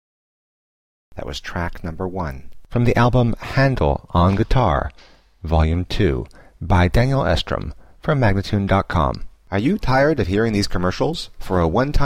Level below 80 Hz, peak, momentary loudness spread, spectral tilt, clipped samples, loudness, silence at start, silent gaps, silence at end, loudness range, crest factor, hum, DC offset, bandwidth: -28 dBFS; -6 dBFS; 13 LU; -7 dB/octave; under 0.1%; -20 LUFS; 1.1 s; none; 0 s; 2 LU; 14 dB; none; under 0.1%; 15 kHz